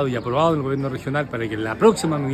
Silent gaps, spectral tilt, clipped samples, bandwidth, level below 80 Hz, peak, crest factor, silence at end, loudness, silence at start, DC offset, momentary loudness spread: none; -6 dB/octave; under 0.1%; 13.5 kHz; -48 dBFS; -2 dBFS; 18 dB; 0 s; -21 LUFS; 0 s; under 0.1%; 8 LU